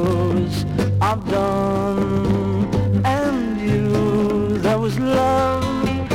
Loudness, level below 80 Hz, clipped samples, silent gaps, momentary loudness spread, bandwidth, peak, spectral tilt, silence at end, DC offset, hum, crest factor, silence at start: -19 LUFS; -38 dBFS; under 0.1%; none; 3 LU; 16 kHz; -6 dBFS; -7.5 dB/octave; 0 s; under 0.1%; none; 14 dB; 0 s